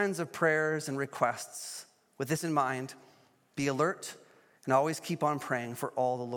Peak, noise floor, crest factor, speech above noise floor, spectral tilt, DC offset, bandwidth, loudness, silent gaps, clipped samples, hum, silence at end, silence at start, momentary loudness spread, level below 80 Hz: -12 dBFS; -61 dBFS; 20 dB; 29 dB; -5 dB/octave; under 0.1%; 17.5 kHz; -32 LUFS; none; under 0.1%; none; 0 s; 0 s; 14 LU; -78 dBFS